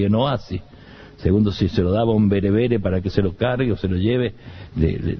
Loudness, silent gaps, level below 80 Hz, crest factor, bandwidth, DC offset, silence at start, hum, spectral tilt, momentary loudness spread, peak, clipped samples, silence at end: -20 LUFS; none; -36 dBFS; 16 dB; 6.4 kHz; under 0.1%; 0 s; none; -9 dB/octave; 9 LU; -4 dBFS; under 0.1%; 0 s